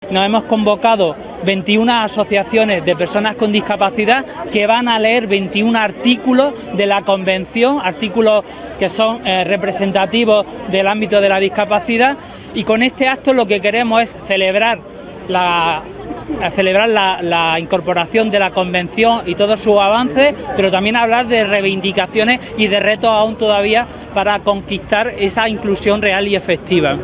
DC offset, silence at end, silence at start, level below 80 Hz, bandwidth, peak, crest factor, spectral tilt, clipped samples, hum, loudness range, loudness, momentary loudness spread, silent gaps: under 0.1%; 0 s; 0 s; -44 dBFS; 4 kHz; 0 dBFS; 14 dB; -9 dB/octave; under 0.1%; none; 2 LU; -14 LUFS; 5 LU; none